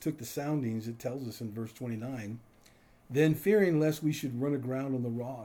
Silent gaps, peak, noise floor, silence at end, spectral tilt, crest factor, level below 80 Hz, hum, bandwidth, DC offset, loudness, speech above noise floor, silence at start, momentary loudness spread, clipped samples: none; -16 dBFS; -61 dBFS; 0 s; -7 dB/octave; 16 dB; -68 dBFS; none; over 20 kHz; under 0.1%; -32 LUFS; 29 dB; 0 s; 13 LU; under 0.1%